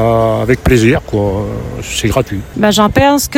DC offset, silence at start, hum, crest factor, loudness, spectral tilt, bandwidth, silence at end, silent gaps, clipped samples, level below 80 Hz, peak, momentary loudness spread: under 0.1%; 0 s; none; 12 dB; -12 LUFS; -5 dB/octave; 17 kHz; 0 s; none; 0.5%; -26 dBFS; 0 dBFS; 10 LU